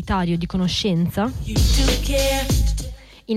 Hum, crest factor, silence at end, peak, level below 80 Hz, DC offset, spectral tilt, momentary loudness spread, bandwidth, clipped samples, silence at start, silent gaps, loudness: none; 12 dB; 0 s; -8 dBFS; -24 dBFS; under 0.1%; -5 dB/octave; 7 LU; 16 kHz; under 0.1%; 0 s; none; -21 LUFS